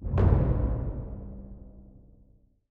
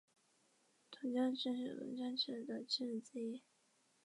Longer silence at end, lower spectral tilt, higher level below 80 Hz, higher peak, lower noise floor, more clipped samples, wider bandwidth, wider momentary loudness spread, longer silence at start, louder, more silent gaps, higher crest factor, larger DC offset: about the same, 0.75 s vs 0.65 s; first, -11.5 dB/octave vs -4 dB/octave; first, -32 dBFS vs under -90 dBFS; first, -10 dBFS vs -26 dBFS; second, -60 dBFS vs -77 dBFS; neither; second, 3.7 kHz vs 11.5 kHz; first, 23 LU vs 9 LU; second, 0 s vs 0.9 s; first, -27 LUFS vs -42 LUFS; neither; about the same, 20 dB vs 18 dB; neither